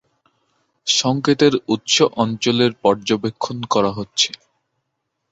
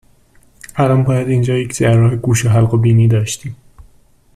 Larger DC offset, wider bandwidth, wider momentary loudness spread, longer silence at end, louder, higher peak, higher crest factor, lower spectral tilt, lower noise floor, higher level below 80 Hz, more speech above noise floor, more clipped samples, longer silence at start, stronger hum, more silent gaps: neither; second, 8.4 kHz vs 13.5 kHz; second, 7 LU vs 10 LU; first, 1.05 s vs 0.8 s; second, -18 LUFS vs -14 LUFS; about the same, -2 dBFS vs -2 dBFS; first, 18 dB vs 12 dB; second, -4 dB/octave vs -6.5 dB/octave; first, -75 dBFS vs -49 dBFS; second, -58 dBFS vs -42 dBFS; first, 57 dB vs 36 dB; neither; about the same, 0.85 s vs 0.75 s; neither; neither